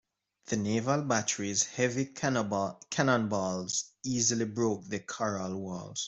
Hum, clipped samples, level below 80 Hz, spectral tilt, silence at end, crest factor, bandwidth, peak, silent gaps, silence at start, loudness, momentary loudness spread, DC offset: none; under 0.1%; -68 dBFS; -4 dB/octave; 0 s; 22 dB; 8.2 kHz; -10 dBFS; none; 0.45 s; -31 LUFS; 8 LU; under 0.1%